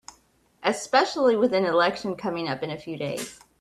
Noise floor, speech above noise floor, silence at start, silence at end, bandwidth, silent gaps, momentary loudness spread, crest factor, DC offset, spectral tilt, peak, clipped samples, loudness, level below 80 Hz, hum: -62 dBFS; 38 dB; 0.6 s; 0.25 s; 13.5 kHz; none; 11 LU; 20 dB; under 0.1%; -4.5 dB/octave; -6 dBFS; under 0.1%; -25 LUFS; -66 dBFS; none